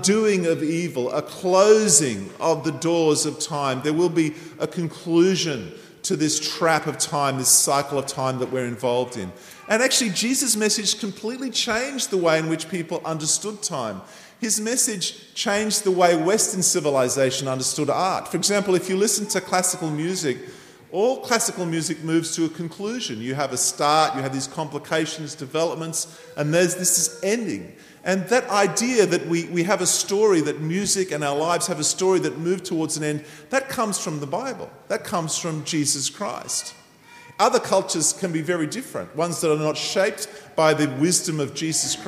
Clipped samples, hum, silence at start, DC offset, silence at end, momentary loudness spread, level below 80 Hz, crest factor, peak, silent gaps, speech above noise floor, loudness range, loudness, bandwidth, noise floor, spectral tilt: under 0.1%; none; 0 s; under 0.1%; 0 s; 10 LU; -66 dBFS; 20 dB; -2 dBFS; none; 25 dB; 4 LU; -22 LUFS; 15.5 kHz; -48 dBFS; -3 dB/octave